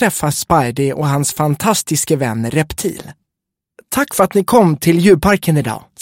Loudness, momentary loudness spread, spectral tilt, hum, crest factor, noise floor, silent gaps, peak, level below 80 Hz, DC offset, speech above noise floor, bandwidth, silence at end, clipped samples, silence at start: -15 LUFS; 9 LU; -5 dB/octave; none; 14 dB; -80 dBFS; none; 0 dBFS; -40 dBFS; under 0.1%; 66 dB; 17 kHz; 0.25 s; under 0.1%; 0 s